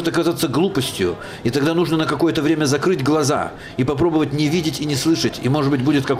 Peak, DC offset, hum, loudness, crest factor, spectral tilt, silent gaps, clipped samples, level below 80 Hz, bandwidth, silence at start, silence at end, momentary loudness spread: -8 dBFS; under 0.1%; none; -19 LUFS; 10 dB; -5.5 dB/octave; none; under 0.1%; -46 dBFS; 16 kHz; 0 s; 0 s; 5 LU